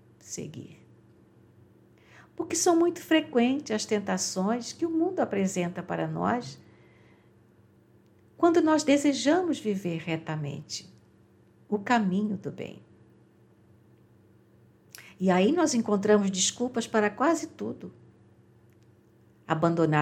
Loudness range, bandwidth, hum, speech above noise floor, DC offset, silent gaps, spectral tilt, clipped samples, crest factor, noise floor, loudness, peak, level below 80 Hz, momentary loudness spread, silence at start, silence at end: 7 LU; 15.5 kHz; none; 33 dB; under 0.1%; none; -4.5 dB/octave; under 0.1%; 20 dB; -59 dBFS; -27 LUFS; -8 dBFS; -74 dBFS; 15 LU; 0.25 s; 0 s